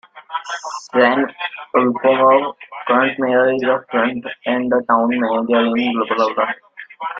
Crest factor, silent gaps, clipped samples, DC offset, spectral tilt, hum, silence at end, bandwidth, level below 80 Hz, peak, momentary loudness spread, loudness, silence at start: 16 dB; none; under 0.1%; under 0.1%; -5 dB/octave; none; 0 s; 7.6 kHz; -64 dBFS; -2 dBFS; 13 LU; -17 LUFS; 0.15 s